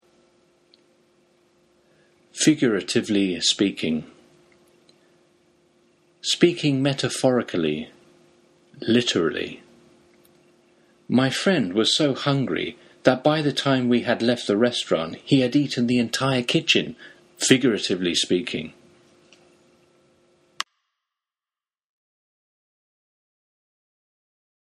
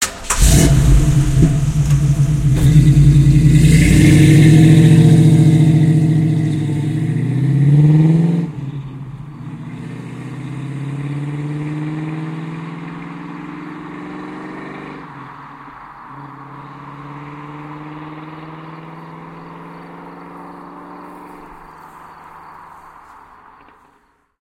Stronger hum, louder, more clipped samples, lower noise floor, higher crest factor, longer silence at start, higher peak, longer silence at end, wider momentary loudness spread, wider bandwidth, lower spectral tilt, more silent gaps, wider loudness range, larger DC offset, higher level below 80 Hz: neither; second, -22 LUFS vs -12 LUFS; neither; first, under -90 dBFS vs -57 dBFS; first, 24 dB vs 14 dB; first, 2.35 s vs 0 s; about the same, 0 dBFS vs 0 dBFS; first, 5.95 s vs 3.15 s; second, 13 LU vs 25 LU; second, 13 kHz vs 14.5 kHz; second, -4.5 dB/octave vs -6.5 dB/octave; neither; second, 18 LU vs 24 LU; neither; second, -64 dBFS vs -26 dBFS